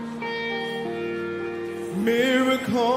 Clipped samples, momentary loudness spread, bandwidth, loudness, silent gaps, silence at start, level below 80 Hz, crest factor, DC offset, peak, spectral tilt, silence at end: under 0.1%; 10 LU; 16 kHz; -25 LUFS; none; 0 s; -64 dBFS; 14 dB; under 0.1%; -10 dBFS; -5 dB/octave; 0 s